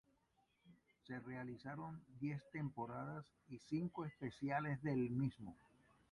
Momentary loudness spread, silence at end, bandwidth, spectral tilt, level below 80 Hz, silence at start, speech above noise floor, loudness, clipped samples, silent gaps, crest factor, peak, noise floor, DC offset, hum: 13 LU; 0.55 s; 11 kHz; -8.5 dB/octave; -76 dBFS; 0.65 s; 35 dB; -46 LUFS; under 0.1%; none; 18 dB; -28 dBFS; -81 dBFS; under 0.1%; none